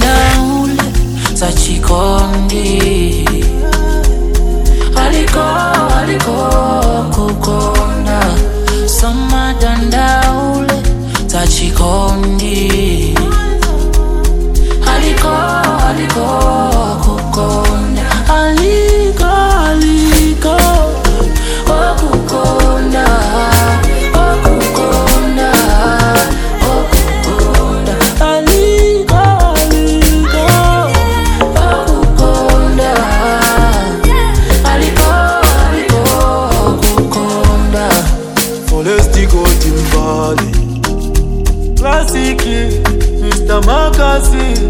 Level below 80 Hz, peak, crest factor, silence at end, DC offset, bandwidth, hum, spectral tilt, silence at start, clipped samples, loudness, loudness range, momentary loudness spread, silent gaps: -12 dBFS; 0 dBFS; 10 dB; 0 s; under 0.1%; over 20 kHz; none; -5 dB/octave; 0 s; 0.4%; -11 LUFS; 3 LU; 5 LU; none